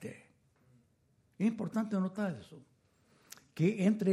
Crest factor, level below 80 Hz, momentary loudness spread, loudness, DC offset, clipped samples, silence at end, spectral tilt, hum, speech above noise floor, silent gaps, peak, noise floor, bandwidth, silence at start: 18 dB; -78 dBFS; 24 LU; -34 LUFS; under 0.1%; under 0.1%; 0 s; -7.5 dB/octave; none; 40 dB; none; -18 dBFS; -72 dBFS; 13.5 kHz; 0 s